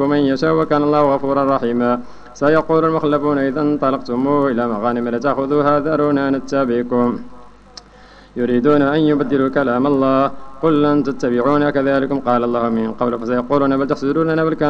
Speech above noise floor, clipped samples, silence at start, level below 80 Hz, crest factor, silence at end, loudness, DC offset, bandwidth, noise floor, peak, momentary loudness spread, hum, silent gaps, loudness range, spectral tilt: 27 dB; under 0.1%; 0 s; -46 dBFS; 14 dB; 0 s; -17 LUFS; under 0.1%; 7 kHz; -43 dBFS; -2 dBFS; 5 LU; 50 Hz at -45 dBFS; none; 2 LU; -7.5 dB/octave